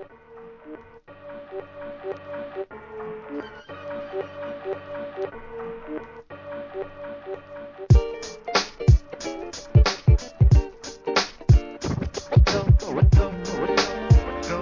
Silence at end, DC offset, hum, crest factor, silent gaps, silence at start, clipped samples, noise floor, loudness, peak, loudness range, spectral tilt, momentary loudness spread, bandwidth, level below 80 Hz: 0 s; under 0.1%; none; 18 dB; none; 0 s; under 0.1%; -46 dBFS; -23 LUFS; -4 dBFS; 15 LU; -6 dB/octave; 19 LU; 7.4 kHz; -26 dBFS